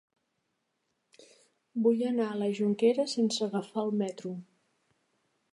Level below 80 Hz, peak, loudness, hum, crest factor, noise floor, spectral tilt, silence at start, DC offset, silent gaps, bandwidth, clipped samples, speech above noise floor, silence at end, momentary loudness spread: -86 dBFS; -14 dBFS; -30 LUFS; none; 18 dB; -80 dBFS; -5.5 dB/octave; 1.75 s; under 0.1%; none; 11.5 kHz; under 0.1%; 51 dB; 1.1 s; 13 LU